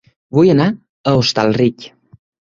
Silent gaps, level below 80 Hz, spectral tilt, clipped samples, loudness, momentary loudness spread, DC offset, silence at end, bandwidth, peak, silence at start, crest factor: 0.89-1.04 s; -48 dBFS; -6.5 dB/octave; under 0.1%; -15 LUFS; 8 LU; under 0.1%; 0.65 s; 7.6 kHz; -2 dBFS; 0.35 s; 14 dB